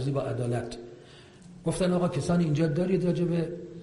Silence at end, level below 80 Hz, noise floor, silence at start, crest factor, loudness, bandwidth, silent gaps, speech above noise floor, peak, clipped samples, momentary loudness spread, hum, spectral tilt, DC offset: 0 s; -52 dBFS; -50 dBFS; 0 s; 14 dB; -28 LUFS; 11.5 kHz; none; 24 dB; -14 dBFS; under 0.1%; 10 LU; none; -7.5 dB/octave; under 0.1%